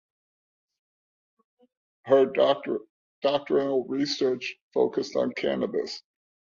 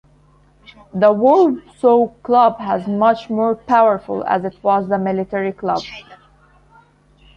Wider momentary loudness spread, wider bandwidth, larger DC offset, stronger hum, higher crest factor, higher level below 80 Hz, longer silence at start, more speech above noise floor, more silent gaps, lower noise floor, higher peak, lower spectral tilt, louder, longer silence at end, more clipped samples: about the same, 11 LU vs 9 LU; second, 7.4 kHz vs 9 kHz; neither; second, none vs 50 Hz at -50 dBFS; about the same, 20 dB vs 16 dB; second, -72 dBFS vs -54 dBFS; first, 2.05 s vs 0.95 s; first, over 65 dB vs 36 dB; first, 2.90-3.22 s, 4.62-4.71 s vs none; first, under -90 dBFS vs -52 dBFS; second, -8 dBFS vs -2 dBFS; second, -5 dB/octave vs -7.5 dB/octave; second, -26 LUFS vs -16 LUFS; second, 0.6 s vs 1.2 s; neither